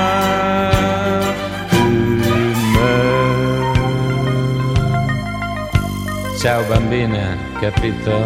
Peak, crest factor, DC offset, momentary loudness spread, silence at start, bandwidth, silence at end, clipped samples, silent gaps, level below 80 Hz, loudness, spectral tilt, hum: 0 dBFS; 16 dB; under 0.1%; 7 LU; 0 s; 16.5 kHz; 0 s; under 0.1%; none; -30 dBFS; -17 LUFS; -6 dB/octave; none